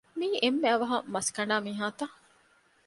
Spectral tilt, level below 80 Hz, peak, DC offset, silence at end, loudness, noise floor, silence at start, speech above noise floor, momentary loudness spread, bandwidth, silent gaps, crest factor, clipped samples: -3 dB/octave; -76 dBFS; -12 dBFS; under 0.1%; 0.75 s; -29 LUFS; -65 dBFS; 0.15 s; 36 dB; 8 LU; 11.5 kHz; none; 18 dB; under 0.1%